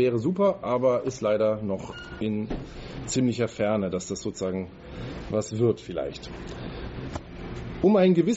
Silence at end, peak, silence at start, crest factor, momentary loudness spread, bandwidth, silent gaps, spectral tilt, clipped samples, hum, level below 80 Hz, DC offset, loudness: 0 s; -8 dBFS; 0 s; 18 dB; 14 LU; 8 kHz; none; -6.5 dB/octave; under 0.1%; none; -46 dBFS; under 0.1%; -27 LUFS